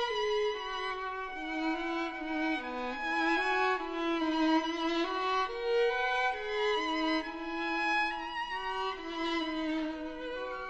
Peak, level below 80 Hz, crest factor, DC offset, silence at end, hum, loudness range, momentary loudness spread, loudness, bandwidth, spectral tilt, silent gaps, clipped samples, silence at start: -18 dBFS; -56 dBFS; 14 dB; under 0.1%; 0 s; none; 3 LU; 8 LU; -32 LUFS; 8.6 kHz; -3 dB/octave; none; under 0.1%; 0 s